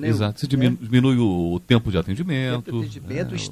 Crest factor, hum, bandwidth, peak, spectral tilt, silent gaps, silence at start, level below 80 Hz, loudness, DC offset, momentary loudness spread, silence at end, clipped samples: 20 dB; none; 14 kHz; -2 dBFS; -7 dB/octave; none; 0 s; -42 dBFS; -22 LUFS; under 0.1%; 10 LU; 0 s; under 0.1%